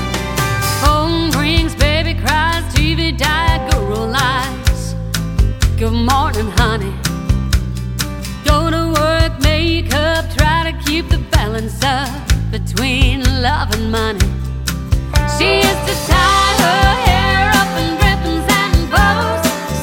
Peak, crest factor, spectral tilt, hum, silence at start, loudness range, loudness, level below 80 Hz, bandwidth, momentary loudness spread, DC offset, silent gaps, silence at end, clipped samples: 0 dBFS; 14 dB; -4.5 dB/octave; none; 0 s; 4 LU; -15 LUFS; -20 dBFS; 18 kHz; 7 LU; under 0.1%; none; 0 s; under 0.1%